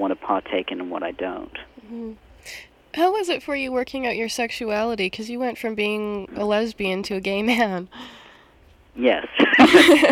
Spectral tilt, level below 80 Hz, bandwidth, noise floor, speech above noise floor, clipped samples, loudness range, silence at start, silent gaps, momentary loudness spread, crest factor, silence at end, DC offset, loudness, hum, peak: -4 dB/octave; -54 dBFS; 16.5 kHz; -53 dBFS; 32 dB; under 0.1%; 7 LU; 0 s; none; 22 LU; 20 dB; 0 s; under 0.1%; -21 LUFS; none; -2 dBFS